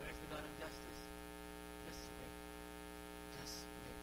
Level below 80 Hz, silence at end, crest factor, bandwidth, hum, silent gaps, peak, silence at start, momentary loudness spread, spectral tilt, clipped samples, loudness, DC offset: -60 dBFS; 0 s; 16 dB; 16 kHz; 60 Hz at -60 dBFS; none; -34 dBFS; 0 s; 4 LU; -3.5 dB/octave; under 0.1%; -51 LUFS; under 0.1%